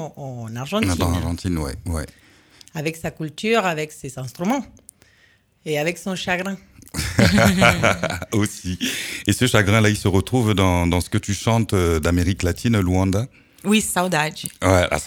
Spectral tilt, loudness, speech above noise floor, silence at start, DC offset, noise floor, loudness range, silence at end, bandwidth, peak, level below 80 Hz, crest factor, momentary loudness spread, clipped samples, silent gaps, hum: -5 dB/octave; -20 LUFS; 37 dB; 0 s; under 0.1%; -57 dBFS; 7 LU; 0 s; 18 kHz; 0 dBFS; -38 dBFS; 20 dB; 14 LU; under 0.1%; none; none